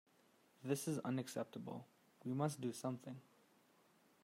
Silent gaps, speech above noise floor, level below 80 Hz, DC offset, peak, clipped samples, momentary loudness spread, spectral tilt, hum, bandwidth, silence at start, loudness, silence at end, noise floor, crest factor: none; 30 dB; -88 dBFS; under 0.1%; -26 dBFS; under 0.1%; 13 LU; -6 dB/octave; none; 16 kHz; 0.6 s; -45 LUFS; 1 s; -73 dBFS; 20 dB